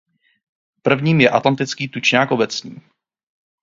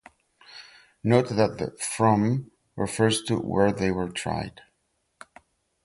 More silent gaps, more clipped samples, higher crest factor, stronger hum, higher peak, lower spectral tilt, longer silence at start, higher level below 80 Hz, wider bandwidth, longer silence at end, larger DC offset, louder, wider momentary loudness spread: neither; neither; about the same, 20 dB vs 22 dB; neither; first, 0 dBFS vs -6 dBFS; about the same, -5 dB/octave vs -5.5 dB/octave; first, 0.85 s vs 0.5 s; second, -60 dBFS vs -52 dBFS; second, 7.6 kHz vs 11.5 kHz; second, 0.9 s vs 1.35 s; neither; first, -17 LUFS vs -25 LUFS; second, 10 LU vs 21 LU